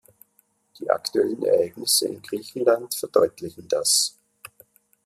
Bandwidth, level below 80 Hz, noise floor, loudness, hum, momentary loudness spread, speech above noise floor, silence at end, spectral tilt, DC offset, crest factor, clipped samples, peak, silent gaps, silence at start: 15 kHz; -70 dBFS; -65 dBFS; -22 LUFS; none; 11 LU; 42 dB; 0.95 s; -2 dB/octave; under 0.1%; 22 dB; under 0.1%; -4 dBFS; none; 0.8 s